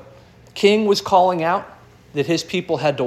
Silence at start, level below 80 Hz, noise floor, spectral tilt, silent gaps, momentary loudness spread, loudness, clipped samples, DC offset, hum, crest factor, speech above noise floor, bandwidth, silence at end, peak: 0.55 s; -56 dBFS; -46 dBFS; -5 dB/octave; none; 10 LU; -19 LUFS; under 0.1%; under 0.1%; none; 18 dB; 28 dB; 13.5 kHz; 0 s; -2 dBFS